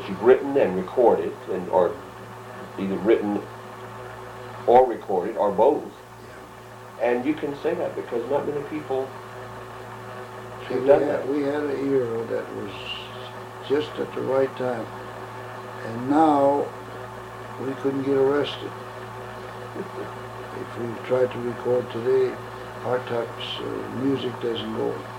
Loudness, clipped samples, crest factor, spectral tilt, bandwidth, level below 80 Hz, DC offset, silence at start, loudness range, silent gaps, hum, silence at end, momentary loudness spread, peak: -24 LUFS; under 0.1%; 22 dB; -6.5 dB/octave; 16.5 kHz; -58 dBFS; under 0.1%; 0 s; 5 LU; none; none; 0 s; 18 LU; -4 dBFS